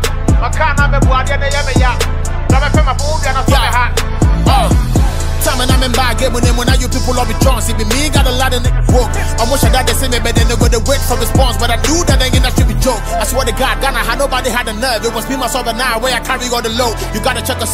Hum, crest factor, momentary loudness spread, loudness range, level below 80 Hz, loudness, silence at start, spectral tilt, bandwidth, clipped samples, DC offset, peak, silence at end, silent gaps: none; 12 dB; 4 LU; 2 LU; -16 dBFS; -13 LUFS; 0 s; -4.5 dB/octave; 16.5 kHz; under 0.1%; 0.1%; 0 dBFS; 0 s; none